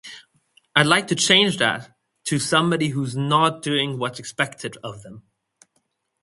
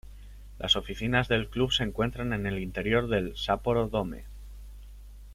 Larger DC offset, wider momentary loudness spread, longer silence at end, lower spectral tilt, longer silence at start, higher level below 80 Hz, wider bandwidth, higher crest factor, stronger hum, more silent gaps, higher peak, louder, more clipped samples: neither; second, 17 LU vs 20 LU; first, 1.05 s vs 0 s; second, -3.5 dB/octave vs -5.5 dB/octave; about the same, 0.05 s vs 0.05 s; second, -62 dBFS vs -42 dBFS; second, 11.5 kHz vs 15.5 kHz; about the same, 22 dB vs 20 dB; second, none vs 50 Hz at -40 dBFS; neither; first, 0 dBFS vs -10 dBFS; first, -20 LUFS vs -28 LUFS; neither